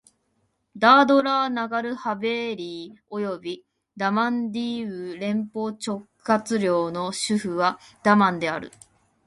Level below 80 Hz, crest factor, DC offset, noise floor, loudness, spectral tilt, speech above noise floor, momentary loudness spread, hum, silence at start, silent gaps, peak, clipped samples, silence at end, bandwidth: -68 dBFS; 22 dB; under 0.1%; -71 dBFS; -23 LUFS; -5 dB/octave; 48 dB; 14 LU; none; 0.75 s; none; -2 dBFS; under 0.1%; 0.6 s; 11.5 kHz